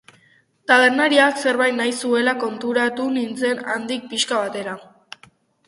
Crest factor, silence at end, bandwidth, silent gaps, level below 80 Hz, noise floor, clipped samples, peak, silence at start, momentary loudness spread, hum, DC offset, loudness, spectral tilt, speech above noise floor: 20 dB; 0.85 s; 11.5 kHz; none; -70 dBFS; -58 dBFS; under 0.1%; 0 dBFS; 0.7 s; 12 LU; none; under 0.1%; -19 LUFS; -2.5 dB/octave; 38 dB